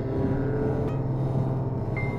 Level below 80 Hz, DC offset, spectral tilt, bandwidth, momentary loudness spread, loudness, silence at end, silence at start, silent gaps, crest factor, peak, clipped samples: -40 dBFS; under 0.1%; -10.5 dB/octave; 5.4 kHz; 2 LU; -27 LUFS; 0 s; 0 s; none; 12 dB; -14 dBFS; under 0.1%